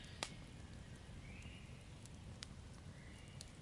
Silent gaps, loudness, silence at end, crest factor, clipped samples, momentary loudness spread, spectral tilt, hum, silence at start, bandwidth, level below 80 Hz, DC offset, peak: none; -54 LUFS; 0 s; 36 dB; under 0.1%; 8 LU; -4 dB/octave; none; 0 s; 11.5 kHz; -62 dBFS; under 0.1%; -18 dBFS